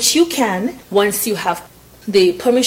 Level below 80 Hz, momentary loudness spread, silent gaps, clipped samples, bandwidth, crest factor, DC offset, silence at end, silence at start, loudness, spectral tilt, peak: -52 dBFS; 9 LU; none; under 0.1%; 17 kHz; 14 dB; under 0.1%; 0 s; 0 s; -16 LUFS; -3 dB/octave; -2 dBFS